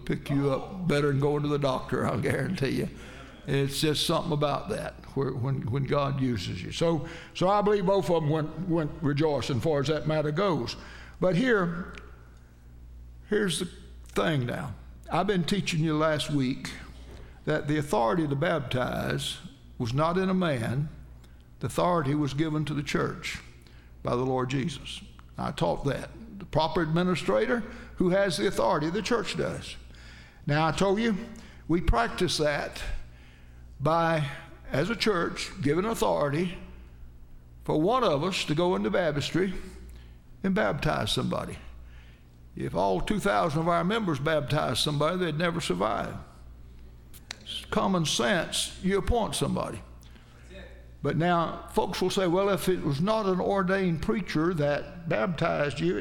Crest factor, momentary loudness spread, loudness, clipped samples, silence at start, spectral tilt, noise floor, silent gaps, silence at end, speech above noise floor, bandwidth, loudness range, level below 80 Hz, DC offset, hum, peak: 18 dB; 14 LU; -28 LUFS; under 0.1%; 0 s; -5.5 dB/octave; -50 dBFS; none; 0 s; 23 dB; 16 kHz; 3 LU; -44 dBFS; under 0.1%; none; -10 dBFS